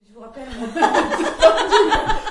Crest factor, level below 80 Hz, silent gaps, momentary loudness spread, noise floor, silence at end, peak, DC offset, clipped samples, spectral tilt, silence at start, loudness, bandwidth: 16 dB; -34 dBFS; none; 17 LU; -37 dBFS; 0 s; 0 dBFS; under 0.1%; under 0.1%; -3 dB/octave; 0.15 s; -16 LUFS; 11.5 kHz